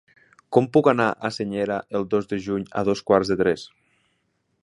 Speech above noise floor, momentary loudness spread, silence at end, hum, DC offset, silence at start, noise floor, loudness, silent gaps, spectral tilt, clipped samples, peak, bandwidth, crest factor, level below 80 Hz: 49 dB; 9 LU; 0.95 s; none; under 0.1%; 0.5 s; -71 dBFS; -23 LUFS; none; -6.5 dB/octave; under 0.1%; -2 dBFS; 11 kHz; 20 dB; -56 dBFS